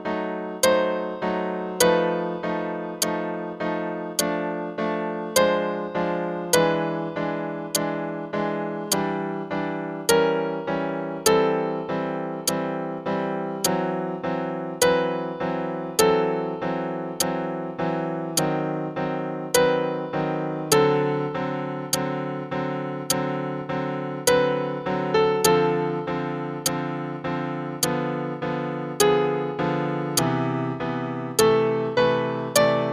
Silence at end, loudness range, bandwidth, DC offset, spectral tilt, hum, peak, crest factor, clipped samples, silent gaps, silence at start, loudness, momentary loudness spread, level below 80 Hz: 0 s; 3 LU; 15 kHz; under 0.1%; -4 dB/octave; none; -2 dBFS; 22 dB; under 0.1%; none; 0 s; -24 LUFS; 9 LU; -58 dBFS